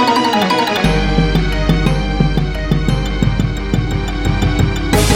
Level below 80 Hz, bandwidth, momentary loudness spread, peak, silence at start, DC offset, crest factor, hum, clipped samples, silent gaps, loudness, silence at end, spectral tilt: -20 dBFS; 16.5 kHz; 5 LU; 0 dBFS; 0 s; under 0.1%; 14 dB; none; under 0.1%; none; -15 LUFS; 0 s; -5.5 dB/octave